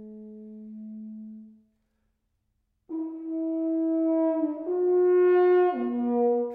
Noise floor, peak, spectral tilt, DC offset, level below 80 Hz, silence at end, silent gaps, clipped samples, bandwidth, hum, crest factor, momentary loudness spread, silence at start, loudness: -75 dBFS; -14 dBFS; -9.5 dB/octave; under 0.1%; -72 dBFS; 0 s; none; under 0.1%; 3.8 kHz; none; 12 dB; 23 LU; 0 s; -25 LUFS